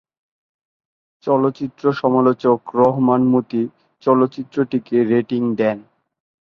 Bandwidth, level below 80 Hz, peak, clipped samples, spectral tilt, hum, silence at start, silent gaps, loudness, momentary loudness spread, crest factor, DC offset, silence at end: 6 kHz; -62 dBFS; -2 dBFS; under 0.1%; -9.5 dB/octave; none; 1.25 s; none; -18 LUFS; 8 LU; 16 dB; under 0.1%; 0.65 s